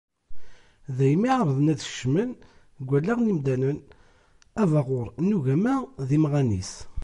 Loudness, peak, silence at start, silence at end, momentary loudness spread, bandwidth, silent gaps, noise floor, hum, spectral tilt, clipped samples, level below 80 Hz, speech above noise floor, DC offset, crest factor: -25 LUFS; -10 dBFS; 0.3 s; 0 s; 12 LU; 10.5 kHz; none; -58 dBFS; none; -7.5 dB/octave; under 0.1%; -50 dBFS; 34 dB; under 0.1%; 14 dB